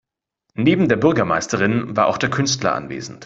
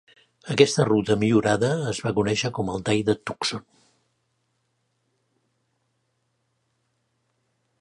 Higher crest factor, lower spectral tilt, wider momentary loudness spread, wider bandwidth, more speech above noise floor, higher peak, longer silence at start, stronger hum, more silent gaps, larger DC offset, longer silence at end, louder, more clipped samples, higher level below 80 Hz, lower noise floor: second, 18 dB vs 24 dB; about the same, -5 dB/octave vs -5 dB/octave; about the same, 7 LU vs 9 LU; second, 8 kHz vs 11.5 kHz; first, 57 dB vs 51 dB; about the same, -2 dBFS vs -2 dBFS; about the same, 0.55 s vs 0.45 s; neither; neither; neither; second, 0 s vs 4.2 s; first, -18 LUFS vs -23 LUFS; neither; about the same, -52 dBFS vs -56 dBFS; about the same, -75 dBFS vs -73 dBFS